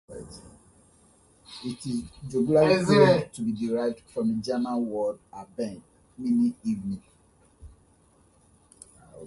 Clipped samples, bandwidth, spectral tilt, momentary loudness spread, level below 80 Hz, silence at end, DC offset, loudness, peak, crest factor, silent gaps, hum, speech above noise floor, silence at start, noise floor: under 0.1%; 11.5 kHz; -6.5 dB/octave; 22 LU; -58 dBFS; 0 s; under 0.1%; -26 LUFS; -4 dBFS; 24 dB; none; none; 36 dB; 0.1 s; -61 dBFS